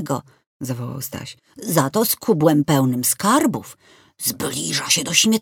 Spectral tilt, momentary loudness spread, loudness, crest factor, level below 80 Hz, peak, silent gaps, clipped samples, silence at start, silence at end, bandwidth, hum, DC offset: -3.5 dB/octave; 14 LU; -19 LUFS; 18 dB; -60 dBFS; -2 dBFS; 0.46-0.60 s; under 0.1%; 0 s; 0 s; 19.5 kHz; none; under 0.1%